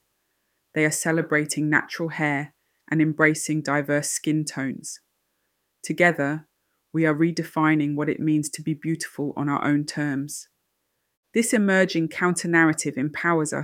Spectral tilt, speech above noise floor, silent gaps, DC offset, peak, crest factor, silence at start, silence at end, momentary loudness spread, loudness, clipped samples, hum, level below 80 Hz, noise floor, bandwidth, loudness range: -5 dB/octave; 52 dB; 11.17-11.23 s; under 0.1%; -4 dBFS; 20 dB; 0.75 s; 0 s; 11 LU; -23 LUFS; under 0.1%; none; -72 dBFS; -75 dBFS; 16 kHz; 3 LU